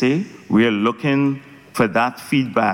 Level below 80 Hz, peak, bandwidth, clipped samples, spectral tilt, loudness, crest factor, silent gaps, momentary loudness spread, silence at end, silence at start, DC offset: -56 dBFS; -6 dBFS; 16.5 kHz; under 0.1%; -6.5 dB/octave; -19 LUFS; 12 dB; none; 6 LU; 0 s; 0 s; under 0.1%